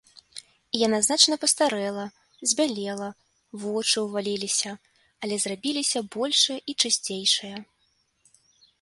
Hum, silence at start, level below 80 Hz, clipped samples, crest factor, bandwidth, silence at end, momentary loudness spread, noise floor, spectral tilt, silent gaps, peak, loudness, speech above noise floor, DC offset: none; 0.35 s; -72 dBFS; under 0.1%; 24 dB; 12 kHz; 1.2 s; 19 LU; -70 dBFS; -1.5 dB/octave; none; -4 dBFS; -24 LUFS; 44 dB; under 0.1%